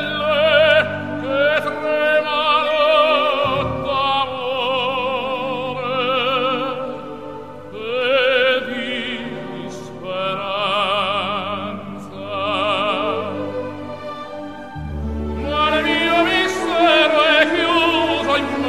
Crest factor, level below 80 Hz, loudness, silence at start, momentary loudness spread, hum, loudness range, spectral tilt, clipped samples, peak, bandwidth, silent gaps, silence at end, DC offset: 18 dB; -42 dBFS; -18 LUFS; 0 s; 16 LU; none; 7 LU; -4.5 dB/octave; under 0.1%; -2 dBFS; 14 kHz; none; 0 s; 0.6%